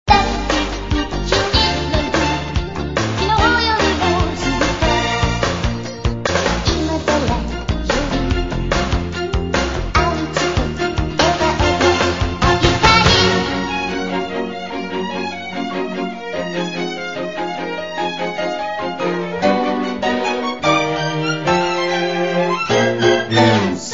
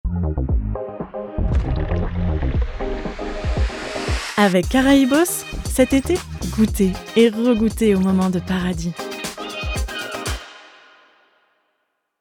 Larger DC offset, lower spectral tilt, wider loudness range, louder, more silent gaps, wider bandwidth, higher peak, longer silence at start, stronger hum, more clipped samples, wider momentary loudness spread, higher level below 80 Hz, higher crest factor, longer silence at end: first, 0.7% vs under 0.1%; about the same, -4.5 dB/octave vs -5.5 dB/octave; about the same, 8 LU vs 9 LU; first, -17 LUFS vs -20 LUFS; neither; second, 7.8 kHz vs 19.5 kHz; about the same, 0 dBFS vs -2 dBFS; about the same, 0.05 s vs 0.05 s; neither; neither; second, 9 LU vs 12 LU; about the same, -28 dBFS vs -28 dBFS; about the same, 18 dB vs 18 dB; second, 0 s vs 1.55 s